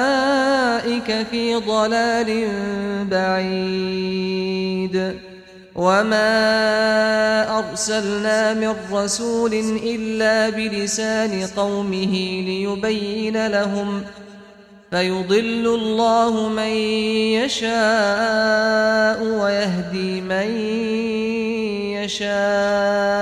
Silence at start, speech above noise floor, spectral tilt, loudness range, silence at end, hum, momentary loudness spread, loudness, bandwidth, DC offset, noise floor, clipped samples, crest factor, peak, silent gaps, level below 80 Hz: 0 s; 26 dB; -4 dB/octave; 4 LU; 0 s; none; 6 LU; -20 LUFS; 14 kHz; under 0.1%; -45 dBFS; under 0.1%; 14 dB; -6 dBFS; none; -54 dBFS